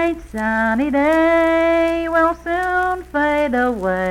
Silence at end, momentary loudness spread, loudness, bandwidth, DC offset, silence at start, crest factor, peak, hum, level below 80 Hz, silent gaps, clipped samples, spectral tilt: 0 s; 6 LU; -17 LUFS; 15 kHz; under 0.1%; 0 s; 12 dB; -4 dBFS; 60 Hz at -60 dBFS; -40 dBFS; none; under 0.1%; -6 dB/octave